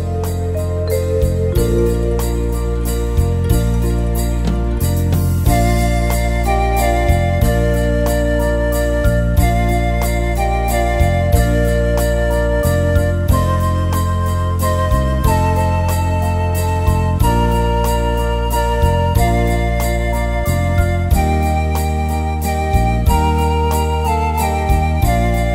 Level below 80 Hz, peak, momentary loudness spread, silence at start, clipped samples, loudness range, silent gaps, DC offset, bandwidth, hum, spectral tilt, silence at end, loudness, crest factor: -20 dBFS; 0 dBFS; 3 LU; 0 s; under 0.1%; 2 LU; none; under 0.1%; 16.5 kHz; none; -6.5 dB/octave; 0 s; -16 LUFS; 14 dB